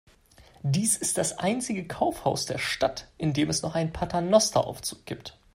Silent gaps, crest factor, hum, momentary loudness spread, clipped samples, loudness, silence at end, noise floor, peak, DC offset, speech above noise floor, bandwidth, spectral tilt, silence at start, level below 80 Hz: none; 20 dB; none; 12 LU; under 0.1%; -27 LUFS; 0.25 s; -56 dBFS; -6 dBFS; under 0.1%; 29 dB; 16 kHz; -4 dB/octave; 0.4 s; -52 dBFS